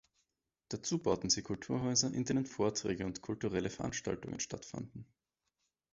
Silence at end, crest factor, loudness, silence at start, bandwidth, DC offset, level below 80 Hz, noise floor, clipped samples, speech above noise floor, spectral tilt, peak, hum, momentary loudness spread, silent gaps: 0.9 s; 20 dB; -36 LUFS; 0.7 s; 7.6 kHz; under 0.1%; -62 dBFS; -85 dBFS; under 0.1%; 49 dB; -5 dB/octave; -16 dBFS; none; 13 LU; none